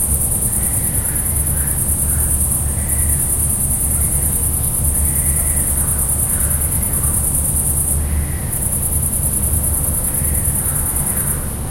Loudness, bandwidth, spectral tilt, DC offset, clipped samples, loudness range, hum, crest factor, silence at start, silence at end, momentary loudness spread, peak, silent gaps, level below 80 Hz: -15 LUFS; 16.5 kHz; -4 dB/octave; under 0.1%; under 0.1%; 1 LU; none; 16 dB; 0 s; 0 s; 2 LU; 0 dBFS; none; -24 dBFS